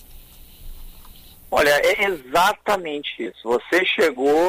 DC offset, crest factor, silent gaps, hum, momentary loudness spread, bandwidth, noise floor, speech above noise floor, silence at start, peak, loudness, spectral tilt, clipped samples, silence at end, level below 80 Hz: under 0.1%; 14 dB; none; none; 11 LU; 16 kHz; -44 dBFS; 24 dB; 0.1 s; -8 dBFS; -20 LUFS; -3 dB/octave; under 0.1%; 0 s; -44 dBFS